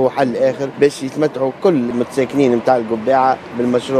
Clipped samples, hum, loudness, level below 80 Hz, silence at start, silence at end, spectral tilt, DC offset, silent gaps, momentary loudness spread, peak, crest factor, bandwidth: under 0.1%; none; -16 LUFS; -58 dBFS; 0 s; 0 s; -6.5 dB/octave; under 0.1%; none; 5 LU; 0 dBFS; 16 dB; 13.5 kHz